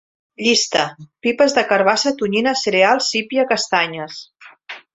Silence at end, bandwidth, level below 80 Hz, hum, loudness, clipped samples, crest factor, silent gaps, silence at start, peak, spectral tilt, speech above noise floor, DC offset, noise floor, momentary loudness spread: 0.15 s; 8.2 kHz; -62 dBFS; none; -17 LUFS; under 0.1%; 18 dB; none; 0.4 s; -2 dBFS; -2.5 dB/octave; 21 dB; under 0.1%; -38 dBFS; 14 LU